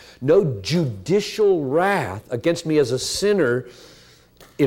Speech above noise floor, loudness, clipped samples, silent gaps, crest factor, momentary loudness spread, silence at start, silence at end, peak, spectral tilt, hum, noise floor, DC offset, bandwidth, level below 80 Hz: 30 dB; -20 LUFS; under 0.1%; none; 14 dB; 6 LU; 0.2 s; 0 s; -6 dBFS; -5.5 dB/octave; none; -50 dBFS; under 0.1%; 16.5 kHz; -54 dBFS